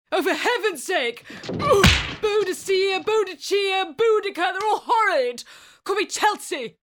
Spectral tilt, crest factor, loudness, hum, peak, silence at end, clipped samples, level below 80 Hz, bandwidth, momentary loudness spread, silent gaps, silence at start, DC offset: -4 dB/octave; 20 dB; -21 LUFS; none; -2 dBFS; 0.2 s; under 0.1%; -40 dBFS; 19.5 kHz; 11 LU; none; 0.1 s; under 0.1%